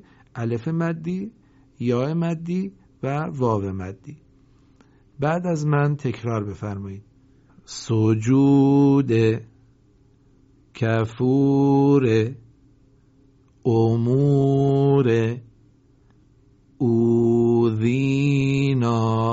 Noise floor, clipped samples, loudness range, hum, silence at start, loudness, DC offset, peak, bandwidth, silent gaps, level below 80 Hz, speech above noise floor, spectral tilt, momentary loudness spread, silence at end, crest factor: -56 dBFS; under 0.1%; 6 LU; none; 0.35 s; -21 LUFS; under 0.1%; -6 dBFS; 8 kHz; none; -56 dBFS; 37 dB; -8 dB/octave; 14 LU; 0 s; 14 dB